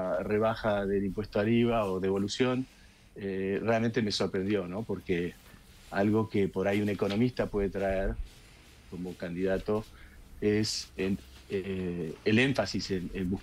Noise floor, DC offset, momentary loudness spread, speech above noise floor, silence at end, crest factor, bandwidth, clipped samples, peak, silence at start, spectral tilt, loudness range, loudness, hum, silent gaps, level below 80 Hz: -54 dBFS; under 0.1%; 10 LU; 24 dB; 0 s; 18 dB; 15.5 kHz; under 0.1%; -12 dBFS; 0 s; -6 dB/octave; 4 LU; -31 LUFS; none; none; -48 dBFS